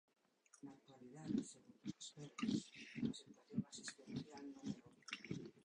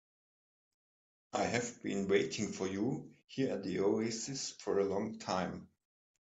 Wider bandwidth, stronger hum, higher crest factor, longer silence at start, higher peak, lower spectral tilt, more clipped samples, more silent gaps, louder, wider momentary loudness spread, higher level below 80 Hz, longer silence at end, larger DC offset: first, 11 kHz vs 8.4 kHz; neither; about the same, 22 dB vs 20 dB; second, 0.55 s vs 1.35 s; second, -28 dBFS vs -18 dBFS; about the same, -5 dB/octave vs -4.5 dB/octave; neither; neither; second, -49 LUFS vs -36 LUFS; first, 16 LU vs 8 LU; second, -80 dBFS vs -74 dBFS; second, 0 s vs 0.75 s; neither